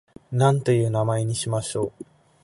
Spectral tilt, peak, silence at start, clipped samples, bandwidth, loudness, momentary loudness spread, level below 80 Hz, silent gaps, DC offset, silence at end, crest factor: -6 dB/octave; -4 dBFS; 0.3 s; under 0.1%; 11.5 kHz; -23 LUFS; 9 LU; -56 dBFS; none; under 0.1%; 0.4 s; 20 dB